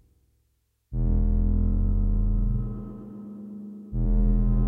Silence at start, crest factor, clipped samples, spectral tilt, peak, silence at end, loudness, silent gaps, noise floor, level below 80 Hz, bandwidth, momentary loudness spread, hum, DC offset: 0.9 s; 12 dB; under 0.1%; -13 dB/octave; -12 dBFS; 0 s; -27 LUFS; none; -71 dBFS; -26 dBFS; 1.5 kHz; 15 LU; none; under 0.1%